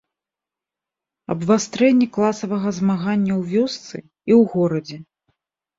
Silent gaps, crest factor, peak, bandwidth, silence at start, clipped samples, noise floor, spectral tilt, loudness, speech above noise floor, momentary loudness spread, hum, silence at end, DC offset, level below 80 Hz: none; 16 dB; -4 dBFS; 7.8 kHz; 1.3 s; under 0.1%; -88 dBFS; -6.5 dB/octave; -19 LUFS; 69 dB; 16 LU; none; 0.75 s; under 0.1%; -62 dBFS